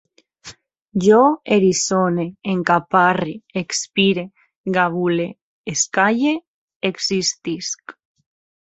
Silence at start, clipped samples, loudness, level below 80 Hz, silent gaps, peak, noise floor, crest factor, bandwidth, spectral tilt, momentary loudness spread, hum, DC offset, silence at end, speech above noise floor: 0.45 s; under 0.1%; -19 LUFS; -60 dBFS; 4.56-4.64 s, 5.42-5.64 s, 6.48-6.68 s, 6.76-6.80 s; -2 dBFS; -43 dBFS; 18 dB; 8.2 kHz; -4 dB/octave; 12 LU; none; under 0.1%; 0.75 s; 25 dB